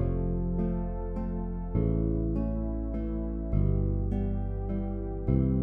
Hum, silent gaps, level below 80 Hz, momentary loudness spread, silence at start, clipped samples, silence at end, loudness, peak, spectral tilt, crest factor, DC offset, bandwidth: none; none; -32 dBFS; 6 LU; 0 s; under 0.1%; 0 s; -31 LUFS; -14 dBFS; -13 dB/octave; 14 dB; under 0.1%; 3.1 kHz